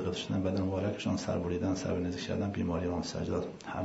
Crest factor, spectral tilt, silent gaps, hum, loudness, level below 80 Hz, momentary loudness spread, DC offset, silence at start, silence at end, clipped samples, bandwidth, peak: 14 dB; -6 dB/octave; none; none; -34 LUFS; -60 dBFS; 3 LU; under 0.1%; 0 s; 0 s; under 0.1%; 7.6 kHz; -20 dBFS